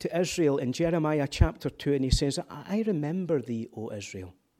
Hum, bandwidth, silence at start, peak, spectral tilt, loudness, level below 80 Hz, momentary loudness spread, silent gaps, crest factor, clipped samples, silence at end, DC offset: none; 16 kHz; 0 s; -6 dBFS; -6 dB/octave; -29 LUFS; -38 dBFS; 11 LU; none; 22 dB; under 0.1%; 0.3 s; under 0.1%